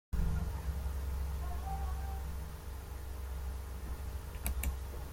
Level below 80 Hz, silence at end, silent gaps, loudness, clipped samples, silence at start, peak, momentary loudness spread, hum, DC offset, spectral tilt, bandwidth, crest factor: -40 dBFS; 0 s; none; -41 LUFS; under 0.1%; 0.1 s; -18 dBFS; 7 LU; none; under 0.1%; -5.5 dB/octave; 16.5 kHz; 20 dB